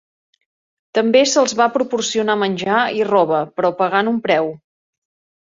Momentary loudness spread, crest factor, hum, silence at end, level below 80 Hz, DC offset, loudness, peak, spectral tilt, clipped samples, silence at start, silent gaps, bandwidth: 6 LU; 16 dB; none; 1 s; -64 dBFS; under 0.1%; -17 LUFS; -2 dBFS; -3.5 dB/octave; under 0.1%; 0.95 s; none; 7.8 kHz